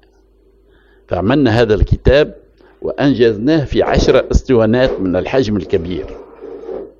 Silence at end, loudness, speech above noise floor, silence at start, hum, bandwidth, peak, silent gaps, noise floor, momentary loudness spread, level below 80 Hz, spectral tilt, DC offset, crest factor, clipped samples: 0.1 s; -14 LUFS; 37 dB; 1.1 s; none; 7.6 kHz; 0 dBFS; none; -50 dBFS; 15 LU; -24 dBFS; -7 dB/octave; under 0.1%; 14 dB; 0.1%